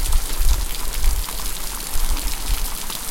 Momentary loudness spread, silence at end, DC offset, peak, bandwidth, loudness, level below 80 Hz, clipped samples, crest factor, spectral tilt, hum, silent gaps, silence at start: 4 LU; 0 s; under 0.1%; -4 dBFS; 17 kHz; -25 LUFS; -20 dBFS; under 0.1%; 14 dB; -2 dB/octave; none; none; 0 s